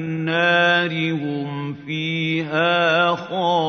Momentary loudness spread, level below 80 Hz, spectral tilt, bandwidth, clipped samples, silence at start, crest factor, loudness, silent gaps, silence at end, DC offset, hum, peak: 10 LU; -68 dBFS; -6 dB/octave; 6.6 kHz; under 0.1%; 0 s; 16 dB; -20 LUFS; none; 0 s; under 0.1%; none; -4 dBFS